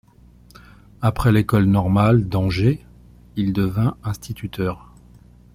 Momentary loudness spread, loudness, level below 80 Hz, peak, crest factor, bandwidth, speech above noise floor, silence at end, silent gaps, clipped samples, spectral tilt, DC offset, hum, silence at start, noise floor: 13 LU; -20 LUFS; -40 dBFS; -4 dBFS; 16 dB; 15.5 kHz; 31 dB; 0.75 s; none; under 0.1%; -8 dB/octave; under 0.1%; 60 Hz at -35 dBFS; 1 s; -49 dBFS